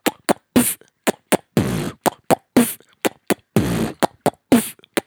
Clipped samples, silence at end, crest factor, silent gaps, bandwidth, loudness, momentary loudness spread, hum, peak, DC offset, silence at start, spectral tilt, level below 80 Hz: under 0.1%; 0.05 s; 20 dB; none; over 20 kHz; -20 LUFS; 7 LU; none; 0 dBFS; under 0.1%; 0.05 s; -4.5 dB/octave; -46 dBFS